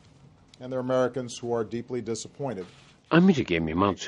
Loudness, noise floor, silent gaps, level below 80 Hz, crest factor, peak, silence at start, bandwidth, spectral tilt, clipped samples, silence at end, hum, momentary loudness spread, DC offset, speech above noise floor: -27 LUFS; -55 dBFS; none; -56 dBFS; 20 dB; -6 dBFS; 0.6 s; 10.5 kHz; -6 dB/octave; under 0.1%; 0 s; none; 14 LU; under 0.1%; 29 dB